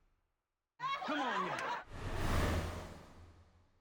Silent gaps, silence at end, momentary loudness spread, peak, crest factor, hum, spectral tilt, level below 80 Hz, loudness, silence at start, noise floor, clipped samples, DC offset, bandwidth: none; 0.35 s; 15 LU; -22 dBFS; 18 dB; none; -5 dB/octave; -48 dBFS; -39 LUFS; 0.8 s; -89 dBFS; under 0.1%; under 0.1%; over 20 kHz